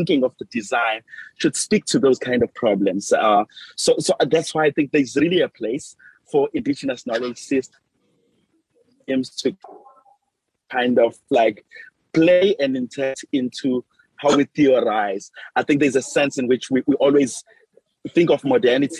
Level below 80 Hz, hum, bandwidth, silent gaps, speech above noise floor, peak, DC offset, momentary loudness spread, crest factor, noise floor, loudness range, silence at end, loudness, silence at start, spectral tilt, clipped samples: -62 dBFS; none; 12.5 kHz; none; 56 dB; -6 dBFS; under 0.1%; 9 LU; 14 dB; -76 dBFS; 7 LU; 0 s; -20 LUFS; 0 s; -4.5 dB/octave; under 0.1%